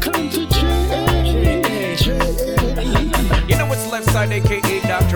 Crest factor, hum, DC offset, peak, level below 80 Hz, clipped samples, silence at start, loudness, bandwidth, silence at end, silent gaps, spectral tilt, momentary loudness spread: 14 dB; none; 0.9%; -2 dBFS; -22 dBFS; under 0.1%; 0 s; -18 LUFS; 20 kHz; 0 s; none; -5 dB/octave; 3 LU